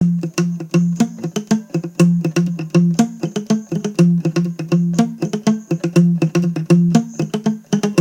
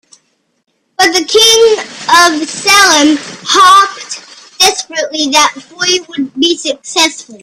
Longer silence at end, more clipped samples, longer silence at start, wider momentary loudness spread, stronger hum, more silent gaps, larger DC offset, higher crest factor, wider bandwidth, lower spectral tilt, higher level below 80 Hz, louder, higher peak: about the same, 0 s vs 0.05 s; second, under 0.1% vs 0.3%; second, 0 s vs 1 s; second, 6 LU vs 12 LU; neither; neither; neither; first, 16 dB vs 10 dB; second, 10 kHz vs over 20 kHz; first, -7 dB/octave vs 0 dB/octave; second, -58 dBFS vs -50 dBFS; second, -17 LUFS vs -8 LUFS; about the same, 0 dBFS vs 0 dBFS